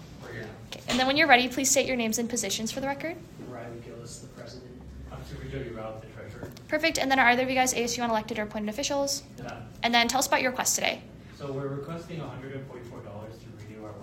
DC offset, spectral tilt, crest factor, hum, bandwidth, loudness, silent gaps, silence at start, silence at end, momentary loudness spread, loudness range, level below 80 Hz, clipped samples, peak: under 0.1%; -2.5 dB/octave; 26 dB; none; 16 kHz; -26 LUFS; none; 0 s; 0 s; 21 LU; 13 LU; -54 dBFS; under 0.1%; -2 dBFS